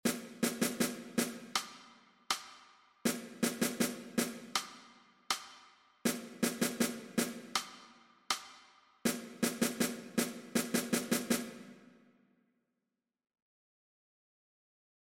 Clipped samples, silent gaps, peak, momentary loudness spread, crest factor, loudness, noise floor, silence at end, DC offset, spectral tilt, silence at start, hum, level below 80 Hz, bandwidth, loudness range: under 0.1%; none; -18 dBFS; 15 LU; 20 dB; -36 LUFS; -88 dBFS; 3.2 s; under 0.1%; -3 dB/octave; 0.05 s; none; -76 dBFS; 16.5 kHz; 3 LU